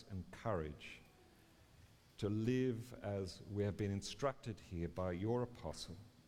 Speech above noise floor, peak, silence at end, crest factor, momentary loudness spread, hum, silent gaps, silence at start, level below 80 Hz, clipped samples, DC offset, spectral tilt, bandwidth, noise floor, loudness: 25 dB; -24 dBFS; 0.05 s; 18 dB; 12 LU; none; none; 0 s; -64 dBFS; under 0.1%; under 0.1%; -6.5 dB/octave; 15 kHz; -66 dBFS; -43 LUFS